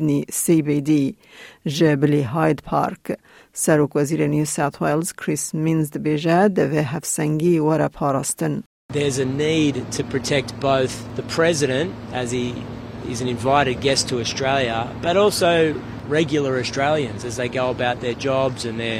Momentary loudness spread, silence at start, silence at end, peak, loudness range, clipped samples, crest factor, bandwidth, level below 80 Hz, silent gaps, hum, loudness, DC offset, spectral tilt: 9 LU; 0 s; 0 s; -2 dBFS; 2 LU; under 0.1%; 18 dB; 16.5 kHz; -50 dBFS; 8.66-8.89 s; none; -21 LUFS; under 0.1%; -5 dB/octave